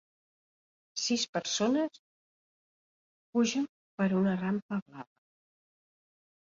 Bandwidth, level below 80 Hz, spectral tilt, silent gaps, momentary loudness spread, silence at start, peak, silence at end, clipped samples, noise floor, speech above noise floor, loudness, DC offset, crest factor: 7.8 kHz; -74 dBFS; -4.5 dB/octave; 1.29-1.33 s, 1.99-3.33 s, 3.69-3.98 s, 4.62-4.69 s, 4.82-4.86 s; 12 LU; 0.95 s; -16 dBFS; 1.45 s; under 0.1%; under -90 dBFS; over 60 dB; -31 LUFS; under 0.1%; 18 dB